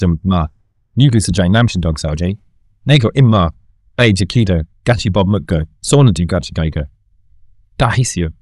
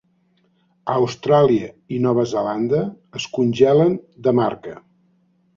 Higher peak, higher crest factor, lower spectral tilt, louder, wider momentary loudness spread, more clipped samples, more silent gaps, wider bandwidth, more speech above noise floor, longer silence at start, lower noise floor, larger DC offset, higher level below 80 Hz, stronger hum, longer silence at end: about the same, 0 dBFS vs -2 dBFS; about the same, 14 dB vs 18 dB; about the same, -6 dB/octave vs -7 dB/octave; first, -14 LUFS vs -19 LUFS; second, 10 LU vs 13 LU; neither; neither; first, 12 kHz vs 7.6 kHz; second, 34 dB vs 44 dB; second, 0 s vs 0.85 s; second, -47 dBFS vs -62 dBFS; neither; first, -32 dBFS vs -58 dBFS; neither; second, 0.1 s vs 0.8 s